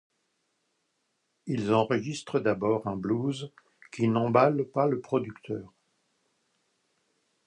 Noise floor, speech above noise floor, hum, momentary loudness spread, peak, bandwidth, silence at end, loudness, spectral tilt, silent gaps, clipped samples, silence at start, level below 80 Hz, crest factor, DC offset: -77 dBFS; 50 dB; none; 15 LU; -10 dBFS; 10.5 kHz; 1.8 s; -28 LUFS; -7 dB/octave; none; under 0.1%; 1.45 s; -66 dBFS; 20 dB; under 0.1%